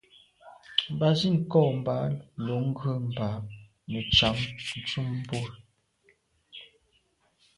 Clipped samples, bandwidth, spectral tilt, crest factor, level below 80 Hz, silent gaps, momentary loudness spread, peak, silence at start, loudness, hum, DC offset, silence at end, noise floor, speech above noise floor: under 0.1%; 11.5 kHz; -6 dB/octave; 22 dB; -52 dBFS; none; 19 LU; -8 dBFS; 0.45 s; -28 LUFS; none; under 0.1%; 0.95 s; -69 dBFS; 42 dB